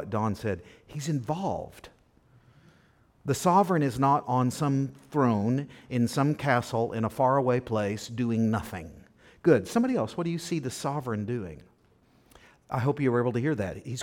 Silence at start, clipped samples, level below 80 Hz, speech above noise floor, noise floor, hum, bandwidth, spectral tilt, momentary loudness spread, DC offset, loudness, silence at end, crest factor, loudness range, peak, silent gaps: 0 s; under 0.1%; -60 dBFS; 36 dB; -63 dBFS; none; 17 kHz; -6.5 dB/octave; 11 LU; under 0.1%; -28 LUFS; 0 s; 18 dB; 6 LU; -10 dBFS; none